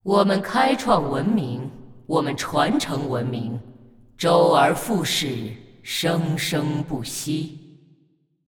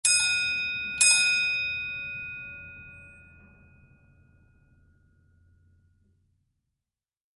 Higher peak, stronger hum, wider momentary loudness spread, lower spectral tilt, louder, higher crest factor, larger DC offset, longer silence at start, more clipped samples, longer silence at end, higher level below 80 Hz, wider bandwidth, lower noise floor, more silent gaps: first, -4 dBFS vs -8 dBFS; neither; second, 13 LU vs 23 LU; first, -5 dB/octave vs 2 dB/octave; about the same, -22 LUFS vs -23 LUFS; second, 18 dB vs 24 dB; neither; about the same, 0.05 s vs 0.05 s; neither; second, 0.85 s vs 4.3 s; first, -54 dBFS vs -60 dBFS; first, 19.5 kHz vs 12 kHz; second, -63 dBFS vs -90 dBFS; neither